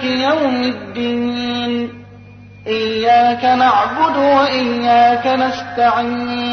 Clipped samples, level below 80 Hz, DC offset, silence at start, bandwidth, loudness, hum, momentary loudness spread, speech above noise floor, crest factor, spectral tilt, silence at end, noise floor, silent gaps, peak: under 0.1%; -54 dBFS; under 0.1%; 0 s; 6.6 kHz; -15 LUFS; 50 Hz at -40 dBFS; 9 LU; 23 dB; 14 dB; -5 dB/octave; 0 s; -38 dBFS; none; -2 dBFS